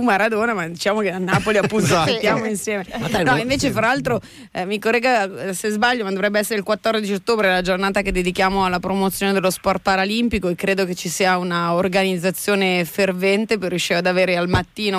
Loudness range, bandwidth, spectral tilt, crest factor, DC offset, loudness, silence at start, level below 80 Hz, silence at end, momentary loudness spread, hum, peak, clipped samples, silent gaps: 1 LU; 16 kHz; -4.5 dB/octave; 14 dB; under 0.1%; -19 LUFS; 0 s; -42 dBFS; 0 s; 5 LU; none; -6 dBFS; under 0.1%; none